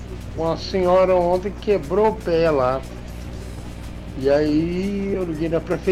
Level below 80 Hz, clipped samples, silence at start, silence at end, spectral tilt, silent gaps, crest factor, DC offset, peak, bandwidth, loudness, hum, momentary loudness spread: -36 dBFS; under 0.1%; 0 s; 0 s; -7 dB/octave; none; 12 dB; under 0.1%; -8 dBFS; 15 kHz; -20 LUFS; 60 Hz at -35 dBFS; 17 LU